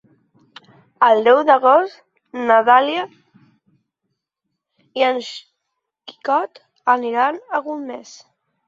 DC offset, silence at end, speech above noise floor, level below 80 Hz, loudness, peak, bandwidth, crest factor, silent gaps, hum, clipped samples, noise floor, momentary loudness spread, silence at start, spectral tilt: under 0.1%; 0.65 s; 62 dB; -74 dBFS; -17 LUFS; -2 dBFS; 7.8 kHz; 18 dB; none; none; under 0.1%; -78 dBFS; 20 LU; 1 s; -3.5 dB/octave